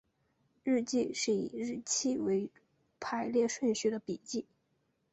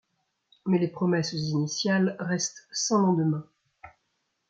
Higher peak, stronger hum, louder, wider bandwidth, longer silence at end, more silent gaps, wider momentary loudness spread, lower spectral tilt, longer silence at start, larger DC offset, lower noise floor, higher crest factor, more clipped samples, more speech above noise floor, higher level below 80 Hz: second, -20 dBFS vs -10 dBFS; neither; second, -34 LUFS vs -27 LUFS; about the same, 8.2 kHz vs 8.8 kHz; about the same, 0.7 s vs 0.6 s; neither; first, 9 LU vs 6 LU; second, -3.5 dB/octave vs -5 dB/octave; about the same, 0.65 s vs 0.65 s; neither; about the same, -77 dBFS vs -77 dBFS; about the same, 16 dB vs 18 dB; neither; second, 44 dB vs 51 dB; about the same, -74 dBFS vs -70 dBFS